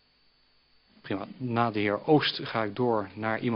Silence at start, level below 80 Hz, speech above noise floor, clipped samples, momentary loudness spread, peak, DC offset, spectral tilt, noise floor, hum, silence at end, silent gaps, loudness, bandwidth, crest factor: 1.05 s; -68 dBFS; 38 dB; under 0.1%; 11 LU; -10 dBFS; under 0.1%; -9 dB/octave; -66 dBFS; none; 0 s; none; -28 LUFS; 5.8 kHz; 20 dB